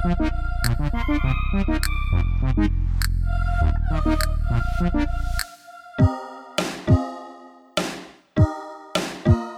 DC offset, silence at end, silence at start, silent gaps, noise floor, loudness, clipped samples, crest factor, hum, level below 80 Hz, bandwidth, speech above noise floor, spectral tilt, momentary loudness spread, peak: under 0.1%; 0 s; 0 s; none; -44 dBFS; -24 LUFS; under 0.1%; 18 dB; none; -24 dBFS; 15.5 kHz; 24 dB; -6 dB/octave; 9 LU; -4 dBFS